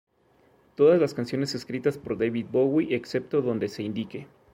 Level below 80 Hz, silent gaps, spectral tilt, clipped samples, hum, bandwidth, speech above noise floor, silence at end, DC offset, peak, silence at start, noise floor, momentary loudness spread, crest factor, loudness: -64 dBFS; none; -6.5 dB/octave; under 0.1%; none; 15.5 kHz; 37 dB; 0.3 s; under 0.1%; -10 dBFS; 0.8 s; -62 dBFS; 12 LU; 18 dB; -26 LUFS